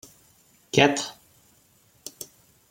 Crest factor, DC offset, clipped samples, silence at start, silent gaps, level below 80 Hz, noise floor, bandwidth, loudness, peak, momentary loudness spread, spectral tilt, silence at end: 26 dB; under 0.1%; under 0.1%; 0.75 s; none; -64 dBFS; -61 dBFS; 16.5 kHz; -23 LUFS; -2 dBFS; 23 LU; -3.5 dB/octave; 0.45 s